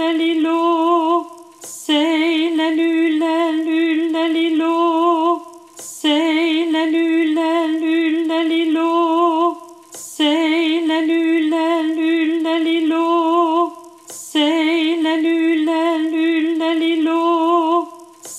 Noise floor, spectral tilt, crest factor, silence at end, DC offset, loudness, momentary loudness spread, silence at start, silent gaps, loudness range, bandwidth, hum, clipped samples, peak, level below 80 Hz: -36 dBFS; -2 dB/octave; 12 dB; 0 s; under 0.1%; -17 LUFS; 6 LU; 0 s; none; 1 LU; 12.5 kHz; none; under 0.1%; -4 dBFS; -80 dBFS